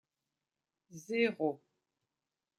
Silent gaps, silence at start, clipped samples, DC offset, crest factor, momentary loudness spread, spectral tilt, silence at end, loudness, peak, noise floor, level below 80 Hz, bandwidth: none; 0.9 s; under 0.1%; under 0.1%; 22 dB; 21 LU; -5 dB/octave; 1 s; -34 LUFS; -18 dBFS; under -90 dBFS; under -90 dBFS; 14 kHz